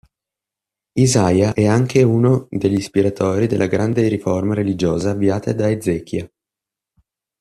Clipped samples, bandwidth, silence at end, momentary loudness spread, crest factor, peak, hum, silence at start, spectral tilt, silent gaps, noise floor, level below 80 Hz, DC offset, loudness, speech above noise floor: under 0.1%; 13 kHz; 1.15 s; 6 LU; 16 dB; -2 dBFS; none; 0.95 s; -6.5 dB/octave; none; -86 dBFS; -50 dBFS; under 0.1%; -17 LUFS; 70 dB